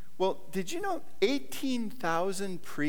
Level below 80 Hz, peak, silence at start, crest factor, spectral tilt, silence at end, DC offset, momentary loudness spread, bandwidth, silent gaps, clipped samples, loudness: -68 dBFS; -14 dBFS; 0.15 s; 20 dB; -4.5 dB/octave; 0 s; 2%; 6 LU; over 20 kHz; none; under 0.1%; -33 LUFS